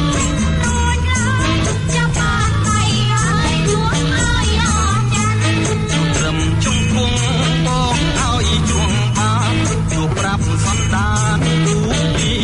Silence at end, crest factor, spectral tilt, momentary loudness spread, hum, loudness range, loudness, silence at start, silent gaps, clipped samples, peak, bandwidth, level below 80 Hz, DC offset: 0 s; 12 dB; -4.5 dB/octave; 2 LU; none; 1 LU; -16 LUFS; 0 s; none; under 0.1%; -4 dBFS; 11 kHz; -26 dBFS; under 0.1%